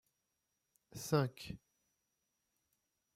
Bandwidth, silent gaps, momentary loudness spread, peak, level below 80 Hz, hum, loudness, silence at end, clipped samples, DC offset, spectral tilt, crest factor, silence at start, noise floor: 16 kHz; none; 18 LU; -18 dBFS; -72 dBFS; none; -38 LUFS; 1.6 s; under 0.1%; under 0.1%; -6 dB/octave; 26 dB; 0.95 s; -86 dBFS